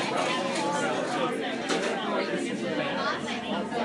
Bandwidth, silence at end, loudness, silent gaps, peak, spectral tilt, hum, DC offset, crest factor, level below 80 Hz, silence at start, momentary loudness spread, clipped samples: 11.5 kHz; 0 s; -29 LUFS; none; -14 dBFS; -4 dB/octave; none; under 0.1%; 14 dB; -74 dBFS; 0 s; 3 LU; under 0.1%